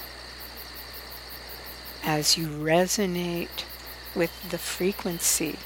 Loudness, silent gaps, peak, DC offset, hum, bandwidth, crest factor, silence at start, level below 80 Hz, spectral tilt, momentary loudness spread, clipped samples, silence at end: -26 LUFS; none; -8 dBFS; under 0.1%; none; 17.5 kHz; 20 dB; 0 s; -50 dBFS; -3 dB/octave; 16 LU; under 0.1%; 0 s